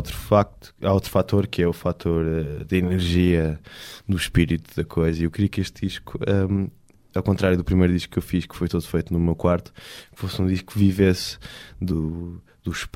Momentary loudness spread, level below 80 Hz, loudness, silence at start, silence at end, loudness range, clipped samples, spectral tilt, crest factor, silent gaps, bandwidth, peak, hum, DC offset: 12 LU; -38 dBFS; -23 LUFS; 0 s; 0.05 s; 2 LU; under 0.1%; -7 dB/octave; 18 dB; none; 16 kHz; -4 dBFS; none; under 0.1%